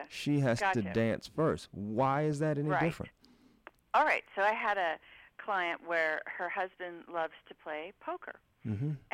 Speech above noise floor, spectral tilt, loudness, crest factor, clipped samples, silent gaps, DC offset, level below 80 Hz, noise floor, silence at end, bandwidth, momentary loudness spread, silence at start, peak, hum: 31 dB; -6.5 dB/octave; -33 LUFS; 18 dB; under 0.1%; none; under 0.1%; -66 dBFS; -64 dBFS; 0.15 s; 15 kHz; 13 LU; 0 s; -16 dBFS; none